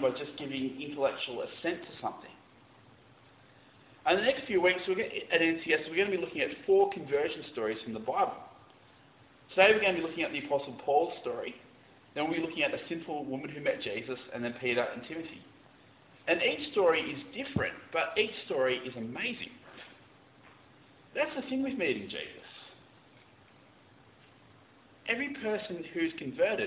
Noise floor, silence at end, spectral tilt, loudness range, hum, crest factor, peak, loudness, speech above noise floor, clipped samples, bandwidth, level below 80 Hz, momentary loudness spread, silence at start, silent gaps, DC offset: -60 dBFS; 0 s; -2 dB/octave; 8 LU; none; 24 dB; -8 dBFS; -31 LUFS; 28 dB; under 0.1%; 4 kHz; -68 dBFS; 14 LU; 0 s; none; under 0.1%